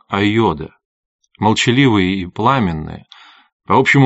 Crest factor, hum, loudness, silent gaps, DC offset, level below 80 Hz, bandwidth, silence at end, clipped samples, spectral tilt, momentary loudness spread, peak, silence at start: 16 dB; none; -15 LUFS; 0.85-1.19 s, 3.52-3.60 s; under 0.1%; -44 dBFS; 8 kHz; 0 s; under 0.1%; -4.5 dB/octave; 16 LU; 0 dBFS; 0.1 s